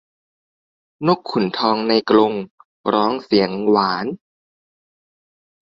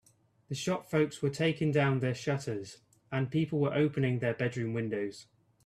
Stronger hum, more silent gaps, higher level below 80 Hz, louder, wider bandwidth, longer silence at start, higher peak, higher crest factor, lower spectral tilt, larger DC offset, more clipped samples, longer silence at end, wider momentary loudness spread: neither; first, 2.51-2.58 s, 2.65-2.84 s vs none; first, -60 dBFS vs -68 dBFS; first, -18 LUFS vs -32 LUFS; second, 7.2 kHz vs 13 kHz; first, 1 s vs 0.5 s; first, -2 dBFS vs -16 dBFS; about the same, 18 dB vs 16 dB; about the same, -7.5 dB/octave vs -6.5 dB/octave; neither; neither; first, 1.6 s vs 0.45 s; about the same, 12 LU vs 10 LU